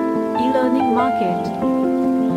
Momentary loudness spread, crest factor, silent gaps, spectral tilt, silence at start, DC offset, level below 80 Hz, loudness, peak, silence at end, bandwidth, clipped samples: 3 LU; 12 dB; none; -7.5 dB/octave; 0 s; under 0.1%; -54 dBFS; -18 LUFS; -6 dBFS; 0 s; 10.5 kHz; under 0.1%